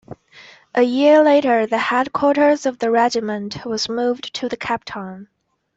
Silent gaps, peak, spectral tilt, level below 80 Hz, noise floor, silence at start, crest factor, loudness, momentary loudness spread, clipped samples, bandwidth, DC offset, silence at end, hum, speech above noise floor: none; -4 dBFS; -4.5 dB/octave; -60 dBFS; -46 dBFS; 0.1 s; 16 dB; -18 LUFS; 13 LU; under 0.1%; 8 kHz; under 0.1%; 0.5 s; none; 28 dB